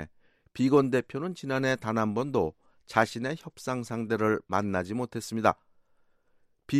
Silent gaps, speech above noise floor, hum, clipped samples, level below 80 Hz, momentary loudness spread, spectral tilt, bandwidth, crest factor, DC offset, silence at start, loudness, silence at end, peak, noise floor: none; 38 dB; none; under 0.1%; -62 dBFS; 11 LU; -6 dB/octave; 15 kHz; 24 dB; under 0.1%; 0 s; -29 LUFS; 0 s; -6 dBFS; -66 dBFS